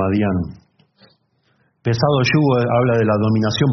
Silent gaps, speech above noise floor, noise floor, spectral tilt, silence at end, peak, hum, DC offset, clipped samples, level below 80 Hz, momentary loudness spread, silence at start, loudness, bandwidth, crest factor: none; 46 dB; -62 dBFS; -6 dB/octave; 0 s; -4 dBFS; none; under 0.1%; under 0.1%; -50 dBFS; 9 LU; 0 s; -17 LUFS; 6.4 kHz; 14 dB